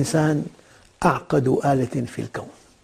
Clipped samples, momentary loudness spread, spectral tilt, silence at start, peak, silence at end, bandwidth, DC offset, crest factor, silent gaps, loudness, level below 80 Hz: under 0.1%; 15 LU; -6.5 dB/octave; 0 s; -6 dBFS; 0.35 s; 15 kHz; under 0.1%; 18 dB; none; -22 LUFS; -50 dBFS